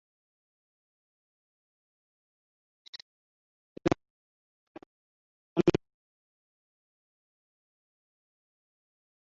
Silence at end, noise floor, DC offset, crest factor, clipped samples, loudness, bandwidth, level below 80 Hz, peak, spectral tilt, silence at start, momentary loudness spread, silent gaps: 3.55 s; under -90 dBFS; under 0.1%; 28 dB; under 0.1%; -31 LUFS; 6.2 kHz; -62 dBFS; -10 dBFS; -6.5 dB/octave; 3.85 s; 21 LU; 4.10-4.75 s, 4.86-5.56 s